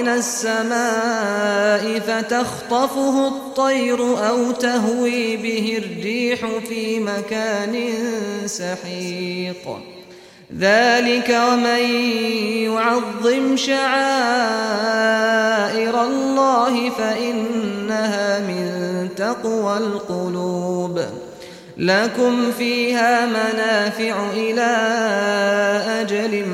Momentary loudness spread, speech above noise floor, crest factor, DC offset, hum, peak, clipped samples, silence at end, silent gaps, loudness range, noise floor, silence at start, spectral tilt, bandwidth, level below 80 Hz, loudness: 8 LU; 24 dB; 16 dB; under 0.1%; none; -4 dBFS; under 0.1%; 0 s; none; 5 LU; -43 dBFS; 0 s; -4 dB/octave; 16 kHz; -62 dBFS; -19 LUFS